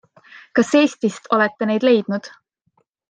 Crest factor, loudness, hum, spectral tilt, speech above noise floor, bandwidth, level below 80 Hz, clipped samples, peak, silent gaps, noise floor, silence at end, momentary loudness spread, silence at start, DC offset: 16 dB; -18 LUFS; none; -5 dB/octave; 48 dB; 9.6 kHz; -68 dBFS; under 0.1%; -2 dBFS; none; -66 dBFS; 0.8 s; 9 LU; 0.55 s; under 0.1%